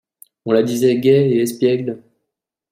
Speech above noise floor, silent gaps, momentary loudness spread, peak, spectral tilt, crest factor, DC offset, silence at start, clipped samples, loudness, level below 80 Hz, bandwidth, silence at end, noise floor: 64 dB; none; 15 LU; -2 dBFS; -6.5 dB/octave; 16 dB; under 0.1%; 0.45 s; under 0.1%; -16 LUFS; -62 dBFS; 16 kHz; 0.75 s; -80 dBFS